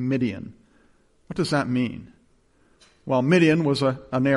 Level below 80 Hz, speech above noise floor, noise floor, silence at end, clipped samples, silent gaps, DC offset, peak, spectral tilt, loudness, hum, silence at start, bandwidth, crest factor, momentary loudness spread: -58 dBFS; 39 dB; -61 dBFS; 0 s; under 0.1%; none; under 0.1%; -6 dBFS; -6.5 dB/octave; -23 LUFS; none; 0 s; 11.5 kHz; 18 dB; 21 LU